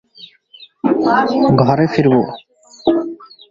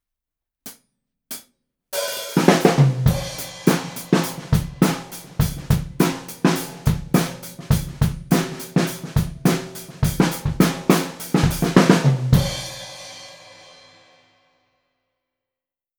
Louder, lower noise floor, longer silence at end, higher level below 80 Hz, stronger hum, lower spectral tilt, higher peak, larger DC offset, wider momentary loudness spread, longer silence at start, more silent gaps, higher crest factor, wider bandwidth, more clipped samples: first, -15 LUFS vs -20 LUFS; second, -44 dBFS vs -89 dBFS; second, 0.25 s vs 2.65 s; second, -50 dBFS vs -36 dBFS; neither; first, -8 dB/octave vs -5.5 dB/octave; about the same, 0 dBFS vs 0 dBFS; neither; second, 14 LU vs 18 LU; second, 0.2 s vs 0.65 s; neither; second, 16 dB vs 22 dB; second, 7.6 kHz vs over 20 kHz; neither